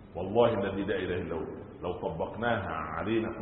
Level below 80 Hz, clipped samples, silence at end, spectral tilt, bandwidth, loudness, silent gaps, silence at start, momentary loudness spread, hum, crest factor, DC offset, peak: -52 dBFS; under 0.1%; 0 s; -10.5 dB/octave; 4.1 kHz; -32 LUFS; none; 0 s; 11 LU; none; 20 dB; under 0.1%; -12 dBFS